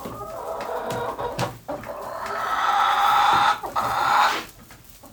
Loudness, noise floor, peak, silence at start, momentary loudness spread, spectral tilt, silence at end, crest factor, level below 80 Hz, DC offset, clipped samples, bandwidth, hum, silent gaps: -22 LUFS; -46 dBFS; -6 dBFS; 0 s; 15 LU; -3 dB/octave; 0.05 s; 18 dB; -52 dBFS; under 0.1%; under 0.1%; over 20 kHz; none; none